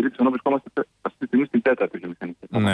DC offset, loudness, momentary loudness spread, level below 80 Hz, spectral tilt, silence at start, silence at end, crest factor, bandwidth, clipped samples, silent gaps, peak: under 0.1%; -23 LUFS; 12 LU; -66 dBFS; -7 dB/octave; 0 s; 0 s; 14 dB; 4.7 kHz; under 0.1%; none; -10 dBFS